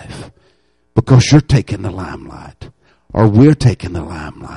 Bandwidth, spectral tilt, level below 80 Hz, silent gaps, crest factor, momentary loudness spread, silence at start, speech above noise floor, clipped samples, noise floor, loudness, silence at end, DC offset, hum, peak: 11 kHz; -7 dB/octave; -34 dBFS; none; 14 dB; 23 LU; 0 s; 45 dB; under 0.1%; -58 dBFS; -13 LUFS; 0 s; under 0.1%; none; 0 dBFS